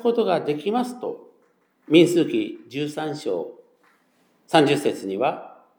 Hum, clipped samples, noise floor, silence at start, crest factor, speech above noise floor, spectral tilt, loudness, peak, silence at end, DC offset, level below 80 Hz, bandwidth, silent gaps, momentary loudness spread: none; under 0.1%; -63 dBFS; 0 s; 20 dB; 42 dB; -5.5 dB/octave; -22 LUFS; -2 dBFS; 0.3 s; under 0.1%; -84 dBFS; 19.5 kHz; none; 15 LU